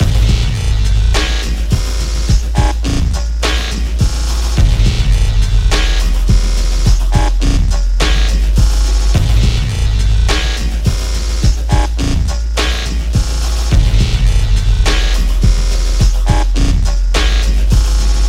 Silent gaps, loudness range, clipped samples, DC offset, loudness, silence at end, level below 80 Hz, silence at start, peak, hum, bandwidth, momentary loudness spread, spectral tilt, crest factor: none; 2 LU; under 0.1%; under 0.1%; -15 LUFS; 0 s; -12 dBFS; 0 s; 0 dBFS; none; 13 kHz; 3 LU; -4.5 dB/octave; 10 dB